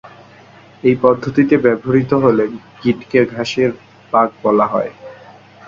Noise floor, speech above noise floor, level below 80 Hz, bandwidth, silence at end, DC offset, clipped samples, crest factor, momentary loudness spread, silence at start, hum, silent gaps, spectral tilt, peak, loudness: -43 dBFS; 28 dB; -52 dBFS; 7.6 kHz; 0.55 s; under 0.1%; under 0.1%; 16 dB; 8 LU; 0.05 s; none; none; -7.5 dB/octave; 0 dBFS; -15 LUFS